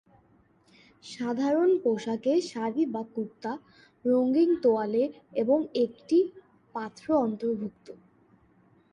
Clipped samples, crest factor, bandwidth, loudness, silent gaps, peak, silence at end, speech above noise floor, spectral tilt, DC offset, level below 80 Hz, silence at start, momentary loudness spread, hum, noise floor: under 0.1%; 16 dB; 10 kHz; -28 LUFS; none; -14 dBFS; 0.95 s; 36 dB; -6.5 dB/octave; under 0.1%; -72 dBFS; 1.05 s; 13 LU; none; -63 dBFS